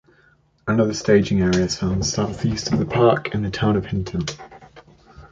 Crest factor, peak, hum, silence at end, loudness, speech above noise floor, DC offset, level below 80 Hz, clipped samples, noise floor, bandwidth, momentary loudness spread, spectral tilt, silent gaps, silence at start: 18 dB; -4 dBFS; none; 0.05 s; -20 LUFS; 38 dB; under 0.1%; -40 dBFS; under 0.1%; -58 dBFS; 9 kHz; 10 LU; -5.5 dB/octave; none; 0.65 s